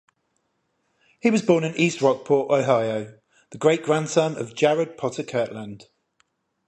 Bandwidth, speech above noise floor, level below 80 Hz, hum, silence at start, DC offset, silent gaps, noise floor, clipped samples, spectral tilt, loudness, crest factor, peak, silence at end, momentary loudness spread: 11 kHz; 51 dB; -68 dBFS; none; 1.25 s; under 0.1%; none; -72 dBFS; under 0.1%; -5.5 dB/octave; -22 LUFS; 20 dB; -4 dBFS; 0.9 s; 10 LU